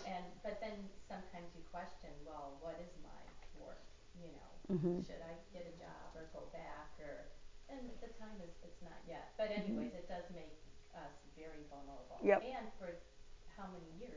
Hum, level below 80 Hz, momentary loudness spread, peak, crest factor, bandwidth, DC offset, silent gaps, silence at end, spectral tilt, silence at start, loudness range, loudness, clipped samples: none; -62 dBFS; 19 LU; -20 dBFS; 26 dB; 7.6 kHz; under 0.1%; none; 0 s; -6.5 dB/octave; 0 s; 11 LU; -47 LUFS; under 0.1%